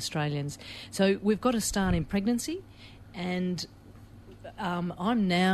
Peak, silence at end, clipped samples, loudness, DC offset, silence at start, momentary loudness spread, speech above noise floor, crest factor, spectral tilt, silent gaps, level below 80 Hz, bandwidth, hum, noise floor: -12 dBFS; 0 s; under 0.1%; -29 LUFS; under 0.1%; 0 s; 16 LU; 21 dB; 18 dB; -5 dB/octave; none; -48 dBFS; 13.5 kHz; none; -50 dBFS